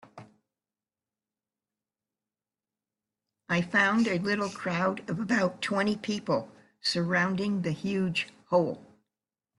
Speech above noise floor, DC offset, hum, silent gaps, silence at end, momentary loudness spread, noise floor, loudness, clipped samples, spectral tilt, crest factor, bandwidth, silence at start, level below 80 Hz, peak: over 62 dB; under 0.1%; none; none; 0.75 s; 8 LU; under -90 dBFS; -28 LUFS; under 0.1%; -5.5 dB/octave; 20 dB; 11.5 kHz; 0.15 s; -70 dBFS; -12 dBFS